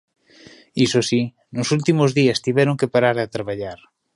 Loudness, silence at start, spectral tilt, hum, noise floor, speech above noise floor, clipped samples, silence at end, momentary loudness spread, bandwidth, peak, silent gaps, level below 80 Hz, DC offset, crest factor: -19 LUFS; 0.75 s; -5.5 dB/octave; none; -47 dBFS; 29 dB; under 0.1%; 0.4 s; 11 LU; 11.5 kHz; -2 dBFS; none; -58 dBFS; under 0.1%; 18 dB